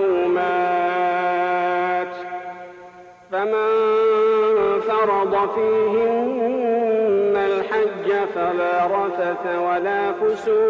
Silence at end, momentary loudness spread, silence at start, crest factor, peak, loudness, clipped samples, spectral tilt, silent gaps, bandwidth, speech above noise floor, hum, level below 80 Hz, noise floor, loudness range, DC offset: 0 s; 6 LU; 0 s; 8 dB; -10 dBFS; -20 LUFS; under 0.1%; -6.5 dB/octave; none; 7.2 kHz; 23 dB; none; -60 dBFS; -43 dBFS; 3 LU; under 0.1%